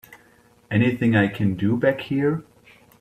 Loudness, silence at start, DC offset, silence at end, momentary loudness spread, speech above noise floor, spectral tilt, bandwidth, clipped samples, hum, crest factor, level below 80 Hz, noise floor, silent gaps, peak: -22 LUFS; 0.1 s; under 0.1%; 0.6 s; 5 LU; 35 dB; -8.5 dB/octave; 15 kHz; under 0.1%; none; 18 dB; -58 dBFS; -56 dBFS; none; -6 dBFS